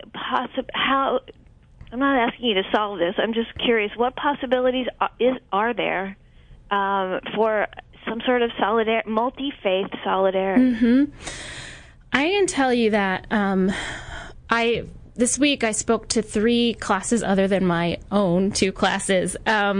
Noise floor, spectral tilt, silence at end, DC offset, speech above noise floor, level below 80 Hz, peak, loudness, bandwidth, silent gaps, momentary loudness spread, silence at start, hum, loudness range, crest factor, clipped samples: -48 dBFS; -4 dB/octave; 0 s; under 0.1%; 26 dB; -48 dBFS; -4 dBFS; -22 LUFS; 11 kHz; none; 8 LU; 0 s; none; 3 LU; 18 dB; under 0.1%